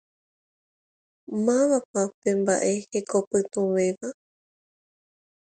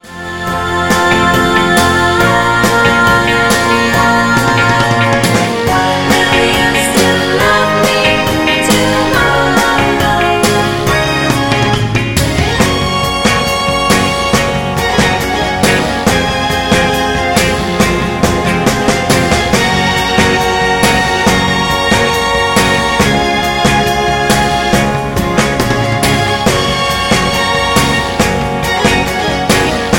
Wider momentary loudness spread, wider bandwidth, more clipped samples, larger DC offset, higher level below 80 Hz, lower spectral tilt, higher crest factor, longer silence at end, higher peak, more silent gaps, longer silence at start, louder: first, 7 LU vs 3 LU; second, 9.4 kHz vs 17 kHz; neither; neither; second, -72 dBFS vs -28 dBFS; about the same, -5 dB/octave vs -4 dB/octave; first, 18 dB vs 10 dB; first, 1.3 s vs 0 s; second, -10 dBFS vs 0 dBFS; first, 1.85-1.93 s, 2.14-2.22 s, 3.27-3.31 s vs none; first, 1.3 s vs 0.05 s; second, -25 LUFS vs -11 LUFS